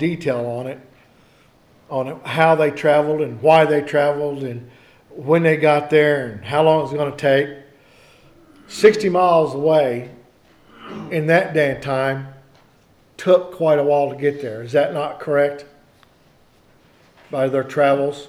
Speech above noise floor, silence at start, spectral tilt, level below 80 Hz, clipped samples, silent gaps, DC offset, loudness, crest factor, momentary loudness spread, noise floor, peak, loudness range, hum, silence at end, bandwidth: 37 dB; 0 s; -6.5 dB/octave; -60 dBFS; under 0.1%; none; under 0.1%; -18 LUFS; 18 dB; 14 LU; -54 dBFS; -2 dBFS; 5 LU; none; 0 s; 13 kHz